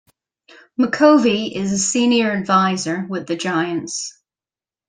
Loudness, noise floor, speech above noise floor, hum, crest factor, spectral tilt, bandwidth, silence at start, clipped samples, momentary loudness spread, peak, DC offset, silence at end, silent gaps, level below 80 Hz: -18 LUFS; under -90 dBFS; over 73 dB; none; 18 dB; -4 dB/octave; 10 kHz; 0.8 s; under 0.1%; 13 LU; -2 dBFS; under 0.1%; 0.8 s; none; -60 dBFS